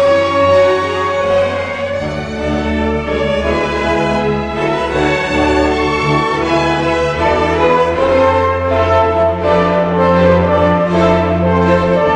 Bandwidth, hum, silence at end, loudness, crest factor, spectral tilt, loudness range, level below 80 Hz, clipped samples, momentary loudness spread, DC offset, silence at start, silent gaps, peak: 10 kHz; none; 0 s; -13 LUFS; 12 dB; -6.5 dB/octave; 4 LU; -30 dBFS; under 0.1%; 6 LU; under 0.1%; 0 s; none; 0 dBFS